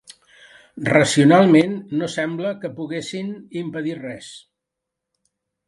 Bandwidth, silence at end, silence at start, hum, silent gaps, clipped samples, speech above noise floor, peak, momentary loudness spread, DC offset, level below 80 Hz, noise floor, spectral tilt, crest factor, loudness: 11.5 kHz; 1.3 s; 0.75 s; none; none; under 0.1%; 64 dB; 0 dBFS; 18 LU; under 0.1%; -64 dBFS; -83 dBFS; -5.5 dB/octave; 20 dB; -19 LUFS